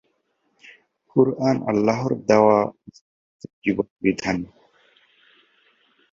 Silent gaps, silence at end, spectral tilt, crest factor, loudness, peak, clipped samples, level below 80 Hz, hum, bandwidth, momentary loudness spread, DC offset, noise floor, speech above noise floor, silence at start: 3.01-3.39 s, 3.53-3.62 s, 3.90-3.96 s; 1.65 s; -7 dB/octave; 22 dB; -21 LUFS; -2 dBFS; under 0.1%; -58 dBFS; none; 7.8 kHz; 11 LU; under 0.1%; -70 dBFS; 50 dB; 1.15 s